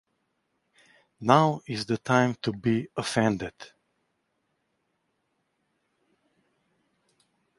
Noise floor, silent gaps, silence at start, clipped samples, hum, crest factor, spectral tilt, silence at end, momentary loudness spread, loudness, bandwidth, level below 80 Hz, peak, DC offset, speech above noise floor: -76 dBFS; none; 1.2 s; under 0.1%; none; 28 dB; -6 dB/octave; 3.95 s; 12 LU; -26 LUFS; 11.5 kHz; -64 dBFS; -2 dBFS; under 0.1%; 51 dB